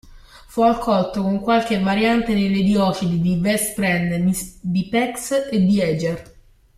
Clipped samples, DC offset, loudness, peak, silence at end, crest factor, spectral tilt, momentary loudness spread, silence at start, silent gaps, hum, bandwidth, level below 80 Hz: under 0.1%; under 0.1%; -19 LUFS; -4 dBFS; 0.55 s; 16 dB; -5.5 dB/octave; 6 LU; 0.05 s; none; none; 15.5 kHz; -44 dBFS